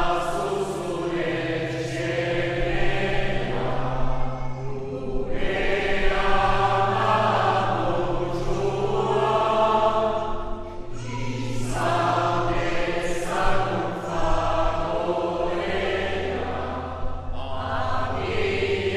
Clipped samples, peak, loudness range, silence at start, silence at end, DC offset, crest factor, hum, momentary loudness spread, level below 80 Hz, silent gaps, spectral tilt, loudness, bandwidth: under 0.1%; -8 dBFS; 5 LU; 0 s; 0 s; under 0.1%; 16 dB; none; 10 LU; -32 dBFS; none; -5.5 dB/octave; -25 LUFS; 11 kHz